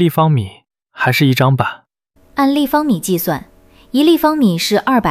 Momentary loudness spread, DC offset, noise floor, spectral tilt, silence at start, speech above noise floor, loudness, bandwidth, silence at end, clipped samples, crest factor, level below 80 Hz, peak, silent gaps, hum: 9 LU; under 0.1%; -53 dBFS; -6 dB/octave; 0 s; 40 dB; -14 LUFS; 16 kHz; 0 s; under 0.1%; 14 dB; -50 dBFS; 0 dBFS; none; none